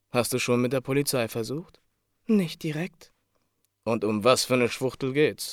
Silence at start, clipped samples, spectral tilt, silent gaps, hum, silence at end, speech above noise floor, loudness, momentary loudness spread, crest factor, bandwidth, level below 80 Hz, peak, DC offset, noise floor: 0.15 s; under 0.1%; -4.5 dB/octave; none; none; 0 s; 48 dB; -26 LUFS; 12 LU; 22 dB; 18 kHz; -64 dBFS; -6 dBFS; under 0.1%; -73 dBFS